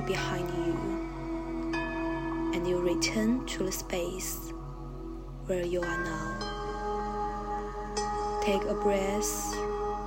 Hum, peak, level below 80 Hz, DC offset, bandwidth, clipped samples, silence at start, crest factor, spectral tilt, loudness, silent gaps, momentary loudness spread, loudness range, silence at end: none; -14 dBFS; -42 dBFS; under 0.1%; 16.5 kHz; under 0.1%; 0 s; 18 dB; -4.5 dB/octave; -32 LUFS; none; 8 LU; 3 LU; 0 s